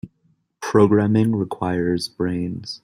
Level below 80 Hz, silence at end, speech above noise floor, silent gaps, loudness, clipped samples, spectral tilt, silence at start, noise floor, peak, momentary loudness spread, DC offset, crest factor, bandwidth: -54 dBFS; 0.05 s; 45 dB; none; -20 LUFS; under 0.1%; -7 dB/octave; 0.05 s; -64 dBFS; -2 dBFS; 11 LU; under 0.1%; 18 dB; 15 kHz